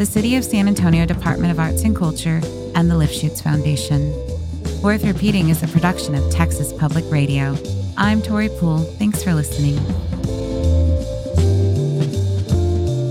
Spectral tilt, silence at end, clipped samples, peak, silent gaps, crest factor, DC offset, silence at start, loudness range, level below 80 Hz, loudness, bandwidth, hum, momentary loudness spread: -6.5 dB/octave; 0 s; under 0.1%; 0 dBFS; none; 16 dB; under 0.1%; 0 s; 2 LU; -30 dBFS; -18 LUFS; 16 kHz; none; 6 LU